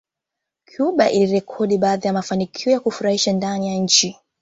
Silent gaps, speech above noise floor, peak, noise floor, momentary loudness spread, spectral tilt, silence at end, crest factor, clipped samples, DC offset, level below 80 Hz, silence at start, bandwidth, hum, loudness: none; 64 dB; -2 dBFS; -83 dBFS; 7 LU; -4 dB/octave; 0.3 s; 18 dB; under 0.1%; under 0.1%; -60 dBFS; 0.8 s; 8 kHz; none; -19 LUFS